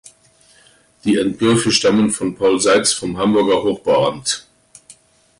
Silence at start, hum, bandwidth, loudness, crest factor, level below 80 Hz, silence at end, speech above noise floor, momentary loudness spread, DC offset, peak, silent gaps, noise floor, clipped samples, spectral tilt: 1.05 s; none; 11.5 kHz; -16 LUFS; 16 dB; -52 dBFS; 1 s; 36 dB; 7 LU; under 0.1%; -2 dBFS; none; -52 dBFS; under 0.1%; -4 dB/octave